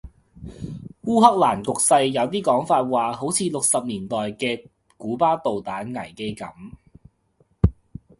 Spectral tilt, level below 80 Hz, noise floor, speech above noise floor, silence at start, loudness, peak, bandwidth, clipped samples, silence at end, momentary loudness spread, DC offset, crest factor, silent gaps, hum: -4.5 dB/octave; -40 dBFS; -63 dBFS; 42 dB; 0.05 s; -21 LUFS; 0 dBFS; 12 kHz; under 0.1%; 0.45 s; 19 LU; under 0.1%; 22 dB; none; none